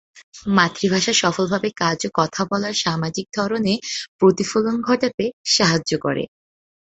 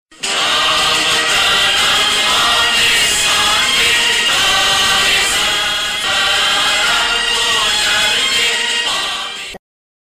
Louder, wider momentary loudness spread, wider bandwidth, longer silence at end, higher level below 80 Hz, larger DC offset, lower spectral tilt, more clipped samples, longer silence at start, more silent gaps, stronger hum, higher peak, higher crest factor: second, -20 LUFS vs -11 LUFS; first, 8 LU vs 5 LU; second, 8.2 kHz vs 17 kHz; about the same, 0.6 s vs 0.5 s; second, -56 dBFS vs -42 dBFS; neither; first, -4 dB/octave vs 0.5 dB/octave; neither; about the same, 0.15 s vs 0.2 s; first, 0.23-0.32 s, 4.08-4.19 s, 5.14-5.18 s, 5.33-5.44 s vs none; neither; about the same, -2 dBFS vs -4 dBFS; first, 20 dB vs 10 dB